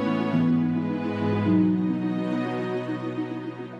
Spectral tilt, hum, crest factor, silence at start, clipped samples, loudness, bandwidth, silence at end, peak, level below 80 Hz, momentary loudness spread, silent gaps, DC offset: -9 dB/octave; none; 14 dB; 0 s; under 0.1%; -25 LUFS; 7.8 kHz; 0 s; -10 dBFS; -66 dBFS; 9 LU; none; under 0.1%